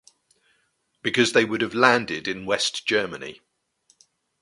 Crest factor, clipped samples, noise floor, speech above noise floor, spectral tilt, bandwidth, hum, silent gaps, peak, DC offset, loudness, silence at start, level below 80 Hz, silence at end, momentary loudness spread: 26 dB; under 0.1%; -70 dBFS; 47 dB; -3 dB/octave; 11.5 kHz; none; none; 0 dBFS; under 0.1%; -22 LUFS; 1.05 s; -64 dBFS; 1.05 s; 13 LU